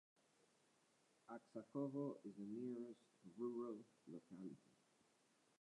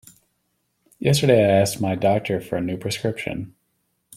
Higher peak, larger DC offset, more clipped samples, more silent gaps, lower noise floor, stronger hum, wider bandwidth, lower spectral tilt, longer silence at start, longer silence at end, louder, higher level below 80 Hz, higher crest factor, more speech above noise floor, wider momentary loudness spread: second, -34 dBFS vs -2 dBFS; neither; neither; neither; first, -80 dBFS vs -71 dBFS; neither; second, 11 kHz vs 16 kHz; first, -8.5 dB/octave vs -5.5 dB/octave; first, 1.3 s vs 1 s; first, 1.05 s vs 0.65 s; second, -52 LUFS vs -21 LUFS; second, under -90 dBFS vs -54 dBFS; about the same, 20 dB vs 20 dB; second, 28 dB vs 51 dB; about the same, 13 LU vs 13 LU